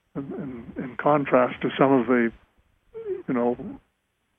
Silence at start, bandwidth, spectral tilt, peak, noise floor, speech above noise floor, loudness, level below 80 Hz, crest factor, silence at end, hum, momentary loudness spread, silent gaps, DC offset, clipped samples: 0.15 s; 3.7 kHz; -9.5 dB/octave; -6 dBFS; -73 dBFS; 50 dB; -24 LUFS; -60 dBFS; 20 dB; 0.6 s; none; 15 LU; none; under 0.1%; under 0.1%